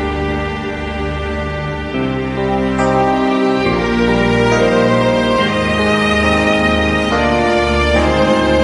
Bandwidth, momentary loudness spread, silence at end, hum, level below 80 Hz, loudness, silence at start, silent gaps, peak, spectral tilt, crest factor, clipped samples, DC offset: 11.5 kHz; 8 LU; 0 s; none; -26 dBFS; -14 LUFS; 0 s; none; 0 dBFS; -6 dB/octave; 14 dB; under 0.1%; under 0.1%